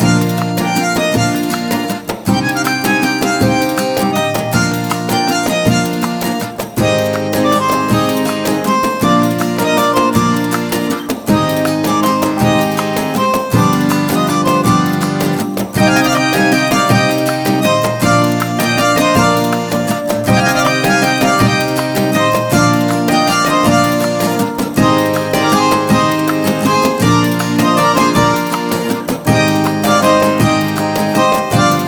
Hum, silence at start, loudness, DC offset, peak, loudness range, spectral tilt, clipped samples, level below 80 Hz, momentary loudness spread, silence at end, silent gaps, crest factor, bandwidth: none; 0 s; -13 LUFS; under 0.1%; 0 dBFS; 2 LU; -5 dB/octave; under 0.1%; -40 dBFS; 5 LU; 0 s; none; 12 dB; over 20 kHz